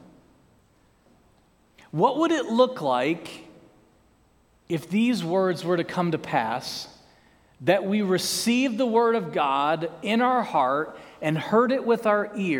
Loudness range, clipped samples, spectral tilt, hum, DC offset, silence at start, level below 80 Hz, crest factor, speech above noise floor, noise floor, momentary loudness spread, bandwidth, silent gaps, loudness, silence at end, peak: 4 LU; under 0.1%; -5 dB/octave; none; under 0.1%; 1.95 s; -66 dBFS; 20 dB; 38 dB; -61 dBFS; 10 LU; 18 kHz; none; -24 LUFS; 0 s; -6 dBFS